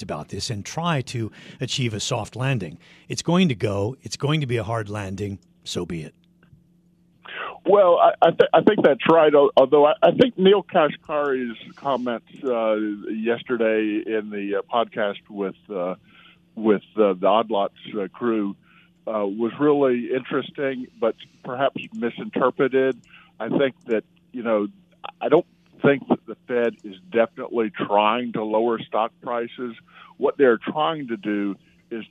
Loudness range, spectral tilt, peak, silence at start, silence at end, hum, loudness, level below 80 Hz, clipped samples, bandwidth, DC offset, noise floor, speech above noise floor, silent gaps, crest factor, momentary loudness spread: 8 LU; -6 dB/octave; -4 dBFS; 0 s; 0.05 s; none; -22 LUFS; -64 dBFS; under 0.1%; 12 kHz; under 0.1%; -59 dBFS; 37 dB; none; 18 dB; 15 LU